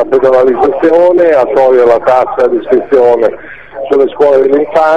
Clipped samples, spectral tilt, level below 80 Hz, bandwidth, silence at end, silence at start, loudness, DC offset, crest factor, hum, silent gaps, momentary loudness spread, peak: 1%; -6.5 dB/octave; -44 dBFS; 7.6 kHz; 0 s; 0 s; -8 LUFS; 2%; 8 dB; none; none; 6 LU; 0 dBFS